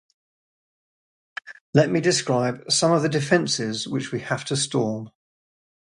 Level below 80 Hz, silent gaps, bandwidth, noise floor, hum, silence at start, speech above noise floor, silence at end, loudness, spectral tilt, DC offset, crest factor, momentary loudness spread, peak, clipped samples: -64 dBFS; 1.61-1.73 s; 11.5 kHz; under -90 dBFS; none; 1.45 s; over 68 dB; 0.75 s; -22 LUFS; -4 dB/octave; under 0.1%; 22 dB; 18 LU; -2 dBFS; under 0.1%